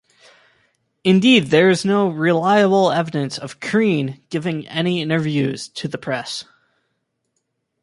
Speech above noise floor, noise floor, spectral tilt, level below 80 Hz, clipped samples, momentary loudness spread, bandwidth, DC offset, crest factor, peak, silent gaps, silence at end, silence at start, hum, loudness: 55 dB; -73 dBFS; -5.5 dB/octave; -62 dBFS; under 0.1%; 14 LU; 11.5 kHz; under 0.1%; 18 dB; -2 dBFS; none; 1.4 s; 1.05 s; none; -18 LUFS